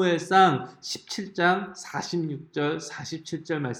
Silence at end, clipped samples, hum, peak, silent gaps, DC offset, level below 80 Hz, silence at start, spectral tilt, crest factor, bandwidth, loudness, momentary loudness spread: 0 s; under 0.1%; none; -8 dBFS; none; under 0.1%; -70 dBFS; 0 s; -4.5 dB/octave; 20 dB; 16.5 kHz; -26 LUFS; 15 LU